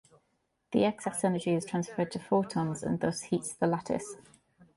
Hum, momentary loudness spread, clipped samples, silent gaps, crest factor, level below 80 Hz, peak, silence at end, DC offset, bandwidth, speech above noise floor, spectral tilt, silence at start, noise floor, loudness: none; 6 LU; under 0.1%; none; 18 dB; -66 dBFS; -14 dBFS; 0.1 s; under 0.1%; 11.5 kHz; 46 dB; -6 dB/octave; 0.7 s; -77 dBFS; -31 LUFS